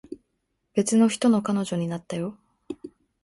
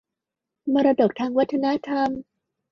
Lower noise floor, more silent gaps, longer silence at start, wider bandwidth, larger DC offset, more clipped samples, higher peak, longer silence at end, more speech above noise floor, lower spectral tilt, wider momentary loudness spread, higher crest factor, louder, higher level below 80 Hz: second, -76 dBFS vs -86 dBFS; neither; second, 0.1 s vs 0.65 s; first, 11.5 kHz vs 6.2 kHz; neither; neither; about the same, -8 dBFS vs -8 dBFS; second, 0.35 s vs 0.5 s; second, 53 dB vs 64 dB; second, -5.5 dB/octave vs -7 dB/octave; first, 20 LU vs 9 LU; about the same, 18 dB vs 16 dB; about the same, -24 LUFS vs -22 LUFS; about the same, -66 dBFS vs -64 dBFS